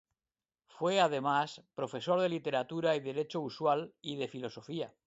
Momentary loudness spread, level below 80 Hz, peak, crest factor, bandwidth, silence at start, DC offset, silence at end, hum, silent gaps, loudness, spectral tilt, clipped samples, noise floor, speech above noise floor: 12 LU; -80 dBFS; -14 dBFS; 20 dB; 8 kHz; 0.75 s; under 0.1%; 0.15 s; none; none; -34 LUFS; -5.5 dB/octave; under 0.1%; under -90 dBFS; over 57 dB